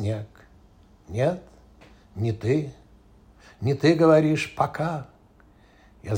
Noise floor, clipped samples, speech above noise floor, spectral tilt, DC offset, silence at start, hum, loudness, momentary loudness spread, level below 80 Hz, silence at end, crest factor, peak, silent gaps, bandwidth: -55 dBFS; under 0.1%; 32 dB; -7 dB/octave; under 0.1%; 0 s; none; -24 LUFS; 20 LU; -54 dBFS; 0 s; 20 dB; -6 dBFS; none; 16 kHz